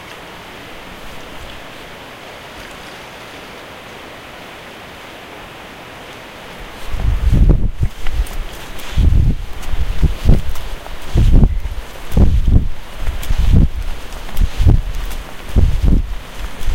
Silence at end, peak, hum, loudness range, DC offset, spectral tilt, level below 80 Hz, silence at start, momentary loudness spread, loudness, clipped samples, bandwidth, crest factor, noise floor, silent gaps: 0 s; 0 dBFS; none; 15 LU; under 0.1%; -6.5 dB/octave; -18 dBFS; 0 s; 18 LU; -18 LUFS; under 0.1%; 16.5 kHz; 16 dB; -33 dBFS; none